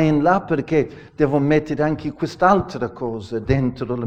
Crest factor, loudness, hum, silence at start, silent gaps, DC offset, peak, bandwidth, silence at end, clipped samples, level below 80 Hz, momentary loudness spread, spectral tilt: 18 dB; -20 LUFS; none; 0 s; none; under 0.1%; -2 dBFS; 8.6 kHz; 0 s; under 0.1%; -42 dBFS; 10 LU; -8 dB/octave